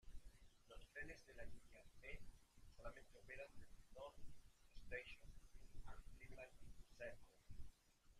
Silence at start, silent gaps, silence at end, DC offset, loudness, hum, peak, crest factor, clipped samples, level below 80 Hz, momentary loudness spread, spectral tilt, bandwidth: 0.05 s; none; 0 s; under 0.1%; -61 LUFS; none; -38 dBFS; 18 dB; under 0.1%; -64 dBFS; 13 LU; -4.5 dB/octave; 14 kHz